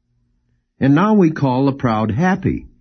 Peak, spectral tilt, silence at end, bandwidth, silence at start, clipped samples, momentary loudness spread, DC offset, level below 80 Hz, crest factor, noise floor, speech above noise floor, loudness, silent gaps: -4 dBFS; -8.5 dB/octave; 0.15 s; 6.4 kHz; 0.8 s; under 0.1%; 7 LU; under 0.1%; -44 dBFS; 14 dB; -64 dBFS; 49 dB; -16 LUFS; none